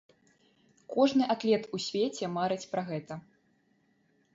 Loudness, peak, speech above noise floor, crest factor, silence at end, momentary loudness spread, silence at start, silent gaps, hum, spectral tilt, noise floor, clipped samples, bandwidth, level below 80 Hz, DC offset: -30 LUFS; -14 dBFS; 41 dB; 20 dB; 1.15 s; 12 LU; 0.9 s; none; none; -5.5 dB/octave; -70 dBFS; under 0.1%; 7.8 kHz; -74 dBFS; under 0.1%